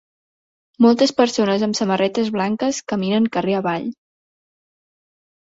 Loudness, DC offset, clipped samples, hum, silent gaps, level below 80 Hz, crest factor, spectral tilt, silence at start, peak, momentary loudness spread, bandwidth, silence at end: -19 LUFS; under 0.1%; under 0.1%; none; none; -62 dBFS; 18 dB; -5 dB/octave; 0.8 s; -2 dBFS; 7 LU; 8 kHz; 1.55 s